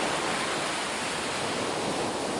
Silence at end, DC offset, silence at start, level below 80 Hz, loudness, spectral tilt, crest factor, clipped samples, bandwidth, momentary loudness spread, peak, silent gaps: 0 s; under 0.1%; 0 s; -60 dBFS; -29 LUFS; -2.5 dB/octave; 14 dB; under 0.1%; 11.5 kHz; 2 LU; -16 dBFS; none